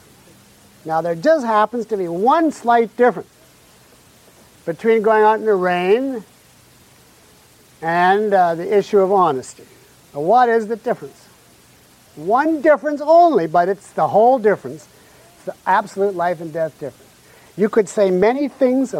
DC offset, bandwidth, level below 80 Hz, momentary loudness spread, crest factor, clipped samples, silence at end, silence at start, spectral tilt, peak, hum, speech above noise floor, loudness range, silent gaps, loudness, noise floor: under 0.1%; 15.5 kHz; -62 dBFS; 16 LU; 16 dB; under 0.1%; 0 s; 0.85 s; -6 dB/octave; -2 dBFS; none; 33 dB; 4 LU; none; -17 LUFS; -49 dBFS